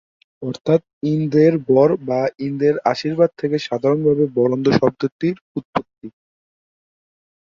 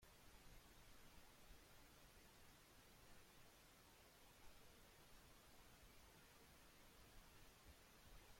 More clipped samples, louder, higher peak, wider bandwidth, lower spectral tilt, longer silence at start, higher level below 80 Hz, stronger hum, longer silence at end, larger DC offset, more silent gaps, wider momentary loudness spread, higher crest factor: neither; first, -18 LUFS vs -68 LUFS; first, -2 dBFS vs -52 dBFS; second, 7.4 kHz vs 16.5 kHz; first, -8 dB/octave vs -3 dB/octave; first, 0.4 s vs 0 s; first, -58 dBFS vs -72 dBFS; neither; first, 1.4 s vs 0 s; neither; first, 0.93-1.01 s, 5.12-5.19 s, 5.41-5.55 s, 5.65-5.73 s vs none; first, 11 LU vs 1 LU; about the same, 16 dB vs 16 dB